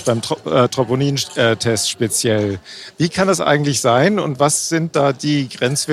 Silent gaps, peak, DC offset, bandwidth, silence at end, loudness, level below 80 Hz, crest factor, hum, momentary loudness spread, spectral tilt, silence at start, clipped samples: none; 0 dBFS; under 0.1%; 15 kHz; 0 s; -17 LUFS; -54 dBFS; 16 dB; none; 5 LU; -4 dB/octave; 0 s; under 0.1%